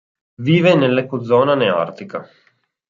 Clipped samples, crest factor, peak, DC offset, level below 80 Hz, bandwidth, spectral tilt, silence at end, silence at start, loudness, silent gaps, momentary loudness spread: under 0.1%; 16 dB; -2 dBFS; under 0.1%; -62 dBFS; 7.4 kHz; -7.5 dB/octave; 0.65 s; 0.4 s; -16 LUFS; none; 17 LU